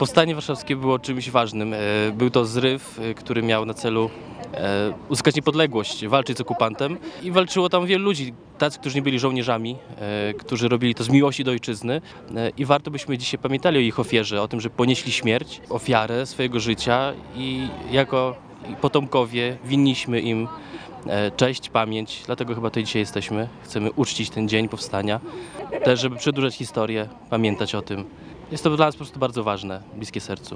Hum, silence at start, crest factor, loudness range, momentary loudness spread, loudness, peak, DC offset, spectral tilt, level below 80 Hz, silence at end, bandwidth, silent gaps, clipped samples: none; 0 s; 22 dB; 3 LU; 10 LU; -23 LUFS; 0 dBFS; under 0.1%; -5 dB/octave; -54 dBFS; 0 s; 10.5 kHz; none; under 0.1%